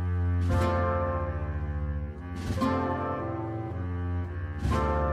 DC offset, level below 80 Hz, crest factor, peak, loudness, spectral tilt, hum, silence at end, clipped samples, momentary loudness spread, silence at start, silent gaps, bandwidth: under 0.1%; -36 dBFS; 14 dB; -14 dBFS; -30 LUFS; -8 dB/octave; none; 0 s; under 0.1%; 8 LU; 0 s; none; 10.5 kHz